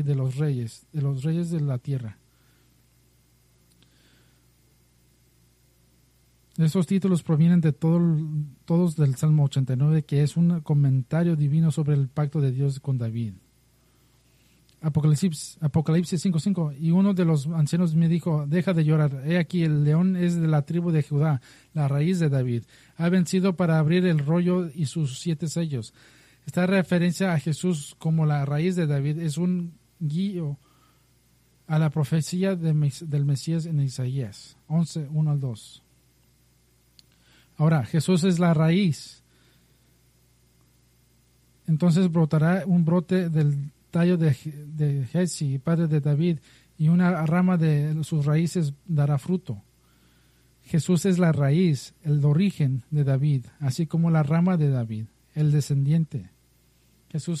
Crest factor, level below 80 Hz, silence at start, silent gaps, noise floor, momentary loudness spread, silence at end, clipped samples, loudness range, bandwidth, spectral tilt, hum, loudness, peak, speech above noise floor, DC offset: 14 dB; -60 dBFS; 0 s; none; -62 dBFS; 9 LU; 0 s; under 0.1%; 6 LU; 12.5 kHz; -7.5 dB/octave; none; -24 LUFS; -10 dBFS; 39 dB; under 0.1%